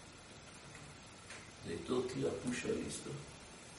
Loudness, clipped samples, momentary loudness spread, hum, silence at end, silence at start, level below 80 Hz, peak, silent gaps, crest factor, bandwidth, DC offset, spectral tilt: -42 LUFS; under 0.1%; 15 LU; none; 0 s; 0 s; -66 dBFS; -24 dBFS; none; 18 dB; 11.5 kHz; under 0.1%; -4.5 dB/octave